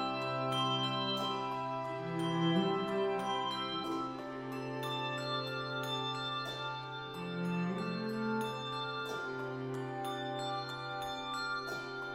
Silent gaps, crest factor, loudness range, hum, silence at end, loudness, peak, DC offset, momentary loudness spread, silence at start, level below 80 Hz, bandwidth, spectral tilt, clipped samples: none; 16 dB; 4 LU; none; 0 s; -37 LUFS; -20 dBFS; under 0.1%; 8 LU; 0 s; -70 dBFS; 16 kHz; -5.5 dB/octave; under 0.1%